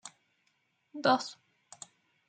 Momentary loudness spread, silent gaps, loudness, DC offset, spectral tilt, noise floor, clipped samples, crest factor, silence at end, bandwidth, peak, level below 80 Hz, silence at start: 22 LU; none; -30 LUFS; under 0.1%; -3.5 dB/octave; -76 dBFS; under 0.1%; 24 dB; 0.95 s; 9.4 kHz; -14 dBFS; -86 dBFS; 0.05 s